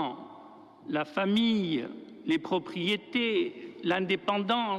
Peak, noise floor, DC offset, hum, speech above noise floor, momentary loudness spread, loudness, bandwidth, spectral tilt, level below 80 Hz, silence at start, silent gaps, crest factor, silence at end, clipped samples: -16 dBFS; -51 dBFS; under 0.1%; none; 22 dB; 15 LU; -30 LUFS; 11 kHz; -6 dB/octave; -74 dBFS; 0 s; none; 14 dB; 0 s; under 0.1%